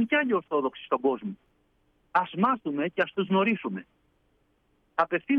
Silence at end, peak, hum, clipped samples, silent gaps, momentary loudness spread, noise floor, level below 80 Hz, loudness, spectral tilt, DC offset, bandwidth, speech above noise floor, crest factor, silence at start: 0 s; -10 dBFS; none; under 0.1%; none; 10 LU; -69 dBFS; -72 dBFS; -27 LUFS; -8 dB/octave; under 0.1%; 6 kHz; 42 dB; 18 dB; 0 s